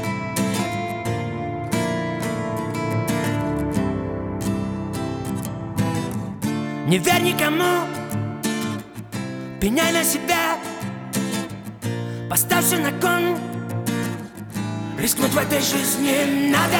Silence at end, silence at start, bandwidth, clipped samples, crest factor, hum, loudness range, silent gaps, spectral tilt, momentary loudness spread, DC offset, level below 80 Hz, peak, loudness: 0 s; 0 s; over 20 kHz; under 0.1%; 20 dB; none; 3 LU; none; -4 dB/octave; 11 LU; under 0.1%; -46 dBFS; -2 dBFS; -22 LUFS